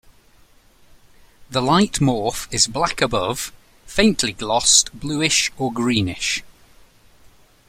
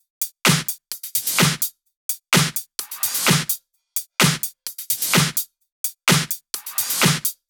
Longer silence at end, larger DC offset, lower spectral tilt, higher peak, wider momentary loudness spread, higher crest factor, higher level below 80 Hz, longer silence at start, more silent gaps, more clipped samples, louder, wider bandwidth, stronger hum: first, 1.15 s vs 0.15 s; neither; about the same, -3 dB/octave vs -2.5 dB/octave; about the same, 0 dBFS vs -2 dBFS; about the same, 11 LU vs 11 LU; about the same, 20 dB vs 20 dB; first, -44 dBFS vs -56 dBFS; first, 1.5 s vs 0.2 s; second, none vs 1.97-2.09 s, 5.72-5.84 s; neither; about the same, -19 LUFS vs -20 LUFS; second, 16 kHz vs over 20 kHz; neither